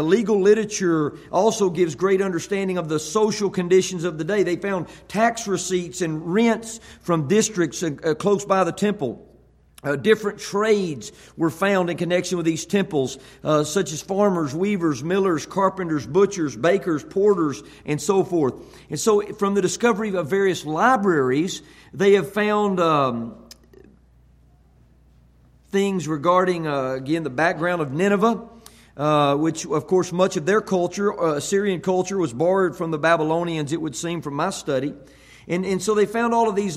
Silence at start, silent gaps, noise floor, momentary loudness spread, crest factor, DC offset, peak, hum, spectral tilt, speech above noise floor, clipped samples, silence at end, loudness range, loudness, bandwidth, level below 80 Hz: 0 s; none; -54 dBFS; 8 LU; 18 dB; under 0.1%; -4 dBFS; none; -5 dB/octave; 33 dB; under 0.1%; 0 s; 3 LU; -21 LUFS; 15 kHz; -56 dBFS